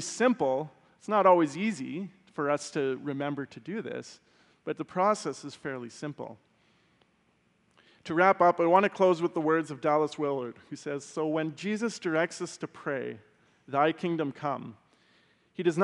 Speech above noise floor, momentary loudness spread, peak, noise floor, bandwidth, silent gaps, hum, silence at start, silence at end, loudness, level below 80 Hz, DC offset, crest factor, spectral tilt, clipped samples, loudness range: 41 dB; 17 LU; -8 dBFS; -69 dBFS; 11.5 kHz; none; none; 0 s; 0 s; -29 LUFS; -80 dBFS; under 0.1%; 22 dB; -5.5 dB/octave; under 0.1%; 8 LU